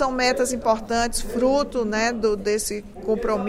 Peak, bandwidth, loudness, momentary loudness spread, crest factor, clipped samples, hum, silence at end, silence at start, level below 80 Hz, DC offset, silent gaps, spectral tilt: -8 dBFS; 16 kHz; -23 LUFS; 4 LU; 14 dB; under 0.1%; none; 0 s; 0 s; -38 dBFS; under 0.1%; none; -3.5 dB/octave